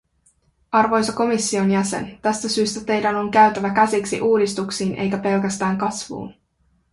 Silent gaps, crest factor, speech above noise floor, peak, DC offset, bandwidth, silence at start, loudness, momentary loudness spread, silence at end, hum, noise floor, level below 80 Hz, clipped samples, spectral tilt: none; 18 dB; 44 dB; -2 dBFS; under 0.1%; 11.5 kHz; 0.7 s; -20 LUFS; 8 LU; 0.6 s; none; -64 dBFS; -56 dBFS; under 0.1%; -4.5 dB/octave